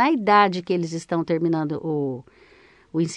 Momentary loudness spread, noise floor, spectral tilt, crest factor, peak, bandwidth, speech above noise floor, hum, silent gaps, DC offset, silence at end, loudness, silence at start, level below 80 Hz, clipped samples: 12 LU; -53 dBFS; -6 dB/octave; 18 dB; -4 dBFS; 10 kHz; 32 dB; none; none; under 0.1%; 0 s; -22 LUFS; 0 s; -64 dBFS; under 0.1%